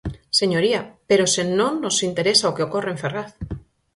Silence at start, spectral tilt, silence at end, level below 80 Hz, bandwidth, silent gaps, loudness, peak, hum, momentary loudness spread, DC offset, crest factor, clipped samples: 0.05 s; -3.5 dB/octave; 0.35 s; -46 dBFS; 11.5 kHz; none; -20 LUFS; -2 dBFS; none; 14 LU; under 0.1%; 20 dB; under 0.1%